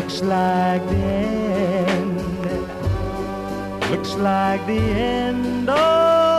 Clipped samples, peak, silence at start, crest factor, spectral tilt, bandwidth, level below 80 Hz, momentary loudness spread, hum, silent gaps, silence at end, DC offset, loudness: under 0.1%; -8 dBFS; 0 s; 12 dB; -6.5 dB/octave; 14.5 kHz; -38 dBFS; 9 LU; none; none; 0 s; under 0.1%; -20 LUFS